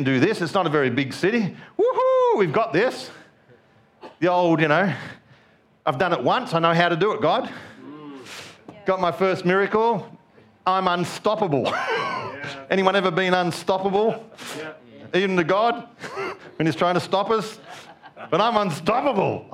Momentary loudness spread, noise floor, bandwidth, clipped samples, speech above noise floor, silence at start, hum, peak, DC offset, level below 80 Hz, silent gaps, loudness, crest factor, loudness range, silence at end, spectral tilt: 16 LU; -57 dBFS; 15 kHz; under 0.1%; 35 dB; 0 s; none; -2 dBFS; under 0.1%; -64 dBFS; none; -22 LUFS; 20 dB; 3 LU; 0.05 s; -6 dB/octave